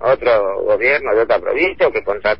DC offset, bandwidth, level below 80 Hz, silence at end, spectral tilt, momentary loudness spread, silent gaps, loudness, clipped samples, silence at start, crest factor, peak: 1%; 5.8 kHz; -46 dBFS; 0.05 s; -7.5 dB/octave; 3 LU; none; -15 LUFS; under 0.1%; 0 s; 12 dB; -4 dBFS